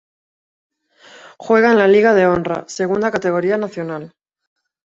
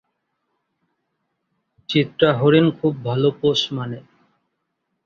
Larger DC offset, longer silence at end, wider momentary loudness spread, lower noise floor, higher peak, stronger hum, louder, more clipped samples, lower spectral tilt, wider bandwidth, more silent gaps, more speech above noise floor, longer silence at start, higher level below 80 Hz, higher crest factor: neither; second, 0.8 s vs 1.05 s; about the same, 15 LU vs 13 LU; second, -46 dBFS vs -75 dBFS; about the same, -2 dBFS vs -2 dBFS; neither; first, -15 LUFS vs -19 LUFS; neither; about the same, -6 dB/octave vs -6.5 dB/octave; about the same, 7.8 kHz vs 7.4 kHz; neither; second, 31 dB vs 57 dB; second, 1.25 s vs 1.9 s; about the same, -56 dBFS vs -58 dBFS; about the same, 16 dB vs 20 dB